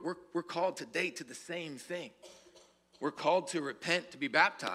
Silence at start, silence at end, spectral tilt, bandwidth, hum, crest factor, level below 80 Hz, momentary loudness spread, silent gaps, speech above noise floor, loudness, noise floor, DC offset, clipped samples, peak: 0 s; 0 s; -3.5 dB/octave; 15 kHz; none; 24 dB; -82 dBFS; 14 LU; none; 28 dB; -34 LUFS; -63 dBFS; under 0.1%; under 0.1%; -10 dBFS